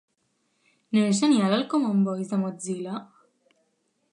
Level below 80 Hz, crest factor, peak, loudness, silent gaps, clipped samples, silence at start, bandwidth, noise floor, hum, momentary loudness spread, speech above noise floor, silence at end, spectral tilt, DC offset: -78 dBFS; 18 dB; -8 dBFS; -25 LUFS; none; under 0.1%; 0.9 s; 10.5 kHz; -72 dBFS; none; 12 LU; 49 dB; 1.1 s; -5.5 dB/octave; under 0.1%